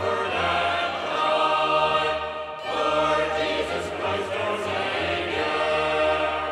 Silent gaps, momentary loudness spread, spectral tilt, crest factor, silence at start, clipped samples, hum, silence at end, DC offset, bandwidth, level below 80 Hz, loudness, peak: none; 6 LU; -4 dB/octave; 14 dB; 0 s; under 0.1%; none; 0 s; under 0.1%; 12.5 kHz; -50 dBFS; -24 LUFS; -10 dBFS